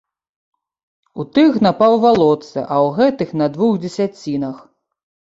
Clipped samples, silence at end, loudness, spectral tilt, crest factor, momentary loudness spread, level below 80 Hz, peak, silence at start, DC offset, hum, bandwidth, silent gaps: under 0.1%; 0.8 s; -16 LUFS; -7 dB/octave; 14 dB; 11 LU; -56 dBFS; -2 dBFS; 1.15 s; under 0.1%; none; 8 kHz; none